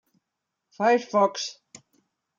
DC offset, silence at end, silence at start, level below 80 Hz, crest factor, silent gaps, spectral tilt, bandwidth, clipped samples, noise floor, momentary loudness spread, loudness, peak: under 0.1%; 0.85 s; 0.8 s; -86 dBFS; 20 dB; none; -3.5 dB/octave; 7.6 kHz; under 0.1%; -83 dBFS; 12 LU; -24 LUFS; -8 dBFS